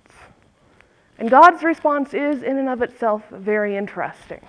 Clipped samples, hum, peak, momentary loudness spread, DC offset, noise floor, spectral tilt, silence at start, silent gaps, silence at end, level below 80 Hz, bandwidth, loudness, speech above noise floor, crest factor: under 0.1%; none; 0 dBFS; 16 LU; under 0.1%; -55 dBFS; -6 dB/octave; 1.2 s; none; 0.1 s; -60 dBFS; 11 kHz; -18 LUFS; 37 dB; 20 dB